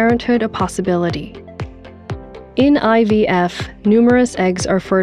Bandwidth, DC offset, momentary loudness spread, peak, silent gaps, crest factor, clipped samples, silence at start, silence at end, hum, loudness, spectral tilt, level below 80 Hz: 11.5 kHz; 0.2%; 18 LU; -2 dBFS; none; 14 dB; under 0.1%; 0 s; 0 s; none; -15 LUFS; -6 dB/octave; -40 dBFS